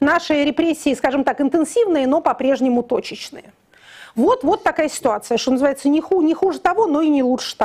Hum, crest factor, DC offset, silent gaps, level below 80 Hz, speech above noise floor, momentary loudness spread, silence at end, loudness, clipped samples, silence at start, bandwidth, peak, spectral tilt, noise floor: none; 14 dB; under 0.1%; none; -54 dBFS; 26 dB; 4 LU; 0 s; -18 LUFS; under 0.1%; 0 s; 15 kHz; -4 dBFS; -4 dB/octave; -44 dBFS